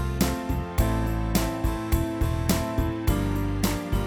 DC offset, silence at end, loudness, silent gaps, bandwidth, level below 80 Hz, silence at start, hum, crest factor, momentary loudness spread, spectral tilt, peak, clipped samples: under 0.1%; 0 s; -26 LUFS; none; over 20 kHz; -30 dBFS; 0 s; none; 18 dB; 2 LU; -5.5 dB/octave; -8 dBFS; under 0.1%